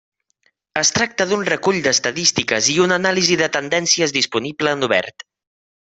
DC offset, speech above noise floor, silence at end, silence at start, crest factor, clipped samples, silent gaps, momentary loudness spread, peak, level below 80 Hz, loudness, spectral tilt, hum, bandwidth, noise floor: under 0.1%; 47 dB; 0.85 s; 0.75 s; 20 dB; under 0.1%; none; 5 LU; 0 dBFS; -58 dBFS; -17 LUFS; -2 dB/octave; none; 8.4 kHz; -65 dBFS